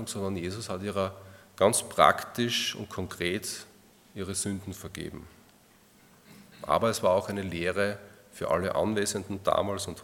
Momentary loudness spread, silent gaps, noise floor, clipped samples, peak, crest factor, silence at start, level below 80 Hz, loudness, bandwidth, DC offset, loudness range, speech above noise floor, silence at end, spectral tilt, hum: 16 LU; none; -59 dBFS; under 0.1%; -4 dBFS; 26 dB; 0 s; -62 dBFS; -29 LUFS; 18 kHz; under 0.1%; 8 LU; 30 dB; 0 s; -3.5 dB/octave; none